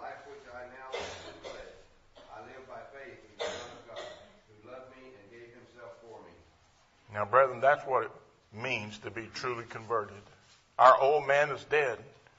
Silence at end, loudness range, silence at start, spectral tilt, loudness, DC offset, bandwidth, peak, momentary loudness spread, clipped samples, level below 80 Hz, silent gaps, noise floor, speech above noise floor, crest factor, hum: 0.35 s; 17 LU; 0 s; -4 dB/octave; -29 LUFS; under 0.1%; 8 kHz; -6 dBFS; 26 LU; under 0.1%; -70 dBFS; none; -65 dBFS; 36 dB; 26 dB; none